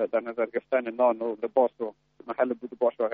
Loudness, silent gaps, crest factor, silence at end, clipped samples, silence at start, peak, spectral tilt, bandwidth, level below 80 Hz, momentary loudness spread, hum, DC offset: -28 LUFS; none; 18 dB; 0 s; under 0.1%; 0 s; -10 dBFS; -4 dB/octave; 4.6 kHz; -76 dBFS; 8 LU; none; under 0.1%